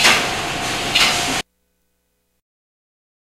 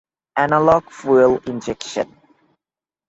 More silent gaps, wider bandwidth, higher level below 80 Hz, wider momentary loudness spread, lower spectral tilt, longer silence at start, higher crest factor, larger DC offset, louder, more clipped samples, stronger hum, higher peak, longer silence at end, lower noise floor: neither; first, 16 kHz vs 8 kHz; first, -44 dBFS vs -52 dBFS; second, 9 LU vs 12 LU; second, -1 dB/octave vs -5.5 dB/octave; second, 0 s vs 0.35 s; about the same, 22 dB vs 18 dB; neither; about the same, -17 LUFS vs -18 LUFS; neither; first, 60 Hz at -55 dBFS vs none; about the same, 0 dBFS vs -2 dBFS; first, 1.95 s vs 1.05 s; second, -69 dBFS vs under -90 dBFS